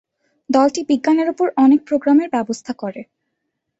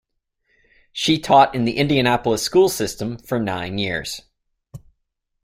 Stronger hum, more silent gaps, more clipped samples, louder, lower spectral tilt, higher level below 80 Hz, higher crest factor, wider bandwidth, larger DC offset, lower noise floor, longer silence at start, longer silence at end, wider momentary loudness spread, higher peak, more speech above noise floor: neither; neither; neither; about the same, -17 LUFS vs -19 LUFS; about the same, -5 dB/octave vs -4.5 dB/octave; second, -64 dBFS vs -50 dBFS; about the same, 16 dB vs 20 dB; second, 8 kHz vs 16 kHz; neither; about the same, -75 dBFS vs -75 dBFS; second, 0.5 s vs 0.95 s; about the same, 0.75 s vs 0.65 s; about the same, 13 LU vs 13 LU; about the same, -2 dBFS vs -2 dBFS; about the same, 59 dB vs 56 dB